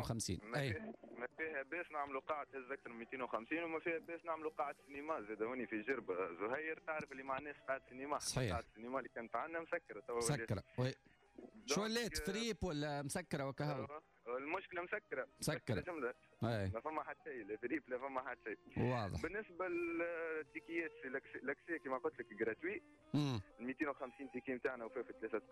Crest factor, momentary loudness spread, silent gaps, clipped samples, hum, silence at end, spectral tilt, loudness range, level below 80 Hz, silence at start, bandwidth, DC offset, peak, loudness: 16 dB; 8 LU; none; under 0.1%; none; 0 s; -5 dB/octave; 2 LU; -66 dBFS; 0 s; 13 kHz; under 0.1%; -28 dBFS; -44 LUFS